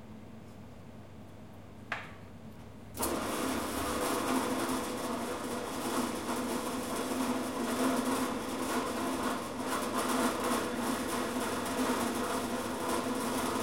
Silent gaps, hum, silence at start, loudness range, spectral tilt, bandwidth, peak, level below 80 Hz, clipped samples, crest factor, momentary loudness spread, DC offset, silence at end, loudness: none; none; 0 s; 5 LU; -3.5 dB/octave; 16.5 kHz; -18 dBFS; -58 dBFS; under 0.1%; 18 dB; 19 LU; 0.2%; 0 s; -34 LUFS